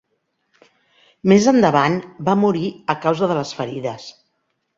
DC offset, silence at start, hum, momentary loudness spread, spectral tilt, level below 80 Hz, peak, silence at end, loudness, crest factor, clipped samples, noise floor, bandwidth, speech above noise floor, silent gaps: under 0.1%; 1.25 s; none; 14 LU; -6 dB/octave; -58 dBFS; -2 dBFS; 0.7 s; -18 LUFS; 18 dB; under 0.1%; -71 dBFS; 7.6 kHz; 54 dB; none